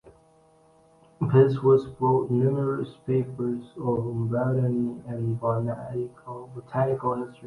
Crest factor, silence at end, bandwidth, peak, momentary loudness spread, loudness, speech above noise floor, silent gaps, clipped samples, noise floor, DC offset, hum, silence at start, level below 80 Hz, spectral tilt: 20 dB; 0 s; 10.5 kHz; -6 dBFS; 12 LU; -26 LUFS; 34 dB; none; under 0.1%; -59 dBFS; under 0.1%; none; 0.05 s; -60 dBFS; -10.5 dB/octave